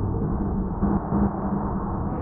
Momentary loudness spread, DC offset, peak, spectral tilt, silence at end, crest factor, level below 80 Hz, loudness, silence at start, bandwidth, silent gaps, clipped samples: 4 LU; under 0.1%; -10 dBFS; -14 dB/octave; 0 s; 14 dB; -32 dBFS; -26 LUFS; 0 s; 2.2 kHz; none; under 0.1%